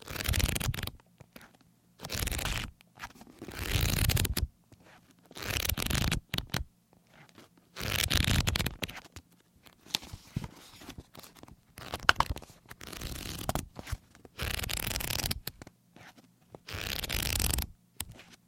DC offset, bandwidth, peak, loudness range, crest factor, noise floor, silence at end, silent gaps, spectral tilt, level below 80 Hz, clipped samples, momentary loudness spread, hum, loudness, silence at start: under 0.1%; 17 kHz; 0 dBFS; 5 LU; 34 dB; -64 dBFS; 0.1 s; none; -3 dB/octave; -42 dBFS; under 0.1%; 23 LU; none; -33 LUFS; 0 s